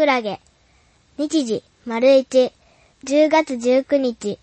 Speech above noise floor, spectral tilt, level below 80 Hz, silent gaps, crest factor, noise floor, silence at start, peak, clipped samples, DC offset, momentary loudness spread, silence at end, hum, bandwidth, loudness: 39 dB; -4 dB/octave; -62 dBFS; none; 16 dB; -57 dBFS; 0 s; -4 dBFS; under 0.1%; under 0.1%; 13 LU; 0.05 s; none; 8.8 kHz; -19 LUFS